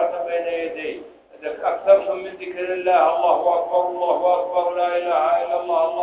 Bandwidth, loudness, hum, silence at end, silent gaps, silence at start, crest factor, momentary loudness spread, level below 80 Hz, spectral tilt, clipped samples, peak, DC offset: 4 kHz; -20 LUFS; none; 0 s; none; 0 s; 18 dB; 12 LU; -64 dBFS; -7.5 dB/octave; under 0.1%; -2 dBFS; under 0.1%